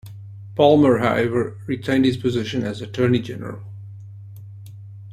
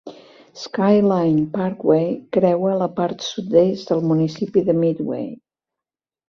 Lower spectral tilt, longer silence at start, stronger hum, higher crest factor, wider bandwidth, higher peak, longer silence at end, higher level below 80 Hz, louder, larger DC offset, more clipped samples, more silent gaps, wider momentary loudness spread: about the same, -7 dB/octave vs -7.5 dB/octave; about the same, 0.05 s vs 0.05 s; neither; about the same, 18 dB vs 18 dB; first, 14 kHz vs 7.2 kHz; about the same, -2 dBFS vs -2 dBFS; second, 0 s vs 0.95 s; first, -54 dBFS vs -60 dBFS; about the same, -20 LUFS vs -19 LUFS; neither; neither; neither; first, 24 LU vs 10 LU